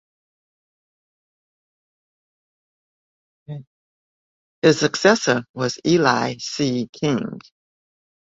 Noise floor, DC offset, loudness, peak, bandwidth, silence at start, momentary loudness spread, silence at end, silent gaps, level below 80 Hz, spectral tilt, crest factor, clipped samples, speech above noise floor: under -90 dBFS; under 0.1%; -20 LUFS; 0 dBFS; 7.8 kHz; 3.5 s; 20 LU; 1 s; 3.67-4.62 s, 5.49-5.54 s, 6.89-6.93 s; -62 dBFS; -4.5 dB/octave; 24 dB; under 0.1%; over 71 dB